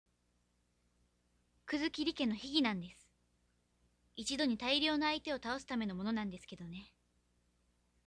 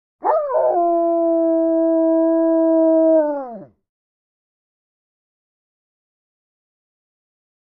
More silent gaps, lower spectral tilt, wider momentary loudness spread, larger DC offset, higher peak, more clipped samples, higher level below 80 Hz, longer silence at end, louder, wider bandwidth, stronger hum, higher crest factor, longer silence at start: neither; second, -4 dB/octave vs -11 dB/octave; first, 17 LU vs 6 LU; neither; second, -18 dBFS vs -6 dBFS; neither; about the same, -68 dBFS vs -66 dBFS; second, 1.2 s vs 4.05 s; second, -37 LUFS vs -17 LUFS; first, 11 kHz vs 2.2 kHz; first, 60 Hz at -65 dBFS vs none; first, 22 dB vs 14 dB; first, 1.7 s vs 0.25 s